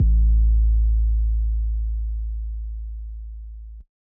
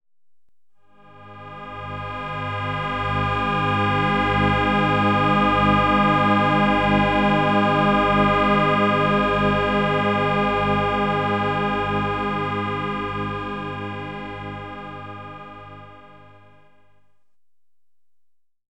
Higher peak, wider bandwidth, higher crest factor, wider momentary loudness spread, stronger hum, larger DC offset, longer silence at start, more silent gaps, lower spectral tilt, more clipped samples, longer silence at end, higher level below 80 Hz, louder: second, -12 dBFS vs -6 dBFS; second, 0.4 kHz vs 9.2 kHz; second, 10 dB vs 16 dB; first, 20 LU vs 17 LU; neither; second, under 0.1% vs 0.3%; second, 0 s vs 1.15 s; neither; first, -14.5 dB/octave vs -7 dB/octave; neither; second, 0.35 s vs 2.65 s; first, -20 dBFS vs -40 dBFS; second, -23 LUFS vs -20 LUFS